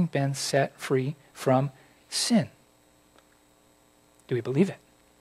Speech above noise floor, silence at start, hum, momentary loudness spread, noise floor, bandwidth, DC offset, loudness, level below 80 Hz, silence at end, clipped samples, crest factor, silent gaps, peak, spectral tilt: 35 dB; 0 s; 60 Hz at -55 dBFS; 10 LU; -61 dBFS; 15 kHz; under 0.1%; -27 LUFS; -72 dBFS; 0.45 s; under 0.1%; 20 dB; none; -10 dBFS; -5 dB/octave